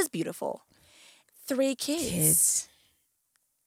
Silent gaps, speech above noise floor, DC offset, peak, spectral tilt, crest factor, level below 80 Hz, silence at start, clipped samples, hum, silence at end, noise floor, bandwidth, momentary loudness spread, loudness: none; 47 dB; under 0.1%; -12 dBFS; -3 dB/octave; 20 dB; -62 dBFS; 0 s; under 0.1%; none; 1 s; -74 dBFS; 17 kHz; 22 LU; -26 LUFS